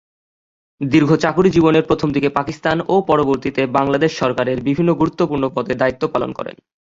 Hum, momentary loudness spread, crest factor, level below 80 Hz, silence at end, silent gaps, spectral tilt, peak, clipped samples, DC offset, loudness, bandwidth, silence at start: none; 7 LU; 16 dB; -46 dBFS; 0.35 s; none; -7 dB/octave; -2 dBFS; under 0.1%; under 0.1%; -17 LUFS; 7.6 kHz; 0.8 s